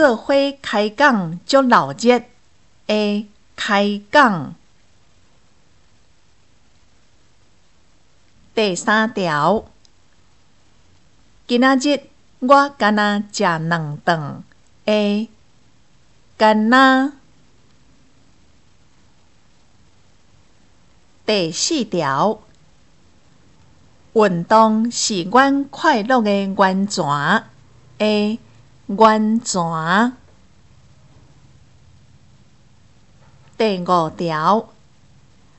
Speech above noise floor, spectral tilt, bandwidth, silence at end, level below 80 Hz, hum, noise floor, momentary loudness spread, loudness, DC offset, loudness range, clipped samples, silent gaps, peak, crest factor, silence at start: 42 dB; -4.5 dB/octave; 8.4 kHz; 0.95 s; -58 dBFS; none; -58 dBFS; 10 LU; -17 LUFS; 0.3%; 7 LU; under 0.1%; none; 0 dBFS; 18 dB; 0 s